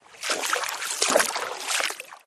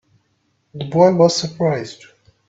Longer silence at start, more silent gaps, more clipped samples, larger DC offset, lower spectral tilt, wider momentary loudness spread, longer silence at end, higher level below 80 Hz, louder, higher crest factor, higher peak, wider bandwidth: second, 0.1 s vs 0.75 s; neither; neither; neither; second, 1 dB/octave vs -5.5 dB/octave; second, 8 LU vs 17 LU; second, 0.1 s vs 0.55 s; second, -76 dBFS vs -60 dBFS; second, -25 LUFS vs -16 LUFS; first, 26 dB vs 18 dB; about the same, -2 dBFS vs 0 dBFS; first, 13.5 kHz vs 8 kHz